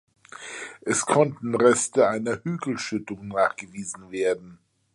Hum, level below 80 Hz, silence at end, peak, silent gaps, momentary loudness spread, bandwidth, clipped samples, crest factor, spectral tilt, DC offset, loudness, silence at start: none; -64 dBFS; 0.4 s; -4 dBFS; none; 15 LU; 11.5 kHz; under 0.1%; 20 dB; -4.5 dB/octave; under 0.1%; -24 LUFS; 0.4 s